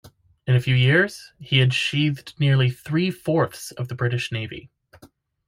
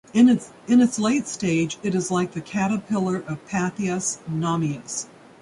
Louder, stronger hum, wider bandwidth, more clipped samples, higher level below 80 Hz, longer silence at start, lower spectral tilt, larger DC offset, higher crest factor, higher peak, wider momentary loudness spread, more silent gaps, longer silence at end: about the same, -22 LUFS vs -23 LUFS; neither; first, 15 kHz vs 11.5 kHz; neither; about the same, -56 dBFS vs -60 dBFS; about the same, 0.05 s vs 0.15 s; about the same, -6 dB/octave vs -5 dB/octave; neither; about the same, 16 dB vs 16 dB; about the same, -6 dBFS vs -6 dBFS; first, 14 LU vs 10 LU; neither; about the same, 0.4 s vs 0.35 s